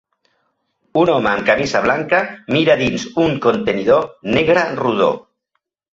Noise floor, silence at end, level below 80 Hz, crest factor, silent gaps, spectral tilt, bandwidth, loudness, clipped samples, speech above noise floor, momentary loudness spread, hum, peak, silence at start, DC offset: -73 dBFS; 0.75 s; -48 dBFS; 16 dB; none; -5.5 dB/octave; 7.8 kHz; -16 LUFS; under 0.1%; 57 dB; 4 LU; none; -2 dBFS; 0.95 s; under 0.1%